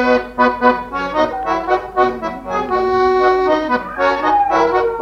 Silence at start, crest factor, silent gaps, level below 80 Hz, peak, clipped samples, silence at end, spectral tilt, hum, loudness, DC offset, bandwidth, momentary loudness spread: 0 s; 14 dB; none; -42 dBFS; -2 dBFS; under 0.1%; 0 s; -5.5 dB/octave; none; -16 LUFS; under 0.1%; 7.4 kHz; 7 LU